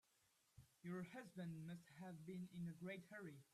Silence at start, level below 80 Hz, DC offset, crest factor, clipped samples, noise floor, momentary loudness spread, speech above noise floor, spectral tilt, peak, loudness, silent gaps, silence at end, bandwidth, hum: 0.55 s; -86 dBFS; under 0.1%; 14 dB; under 0.1%; -82 dBFS; 5 LU; 28 dB; -7 dB/octave; -40 dBFS; -55 LUFS; none; 0.1 s; 14 kHz; none